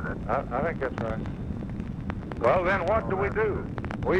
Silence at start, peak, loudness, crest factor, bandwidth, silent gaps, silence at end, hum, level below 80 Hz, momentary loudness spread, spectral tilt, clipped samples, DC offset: 0 s; -10 dBFS; -28 LUFS; 18 dB; 10 kHz; none; 0 s; none; -40 dBFS; 11 LU; -8 dB/octave; under 0.1%; under 0.1%